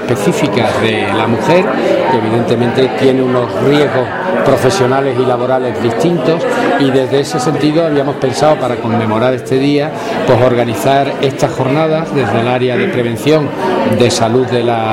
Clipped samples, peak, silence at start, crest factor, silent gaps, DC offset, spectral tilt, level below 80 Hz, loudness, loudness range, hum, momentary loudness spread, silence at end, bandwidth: under 0.1%; 0 dBFS; 0 s; 12 dB; none; under 0.1%; -6 dB/octave; -46 dBFS; -12 LUFS; 1 LU; none; 4 LU; 0 s; 16.5 kHz